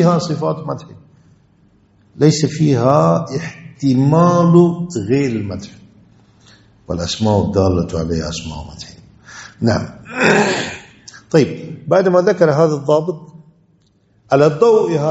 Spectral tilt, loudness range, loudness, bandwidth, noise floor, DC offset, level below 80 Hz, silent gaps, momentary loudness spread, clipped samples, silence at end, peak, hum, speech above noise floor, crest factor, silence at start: -6.5 dB/octave; 6 LU; -15 LUFS; 8.2 kHz; -56 dBFS; under 0.1%; -44 dBFS; none; 17 LU; under 0.1%; 0 s; 0 dBFS; none; 42 dB; 16 dB; 0 s